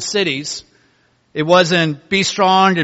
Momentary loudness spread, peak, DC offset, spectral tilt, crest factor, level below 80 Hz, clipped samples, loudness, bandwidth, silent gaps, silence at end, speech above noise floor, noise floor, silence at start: 14 LU; 0 dBFS; under 0.1%; -4 dB/octave; 16 dB; -56 dBFS; under 0.1%; -15 LUFS; 8.2 kHz; none; 0 s; 43 dB; -58 dBFS; 0 s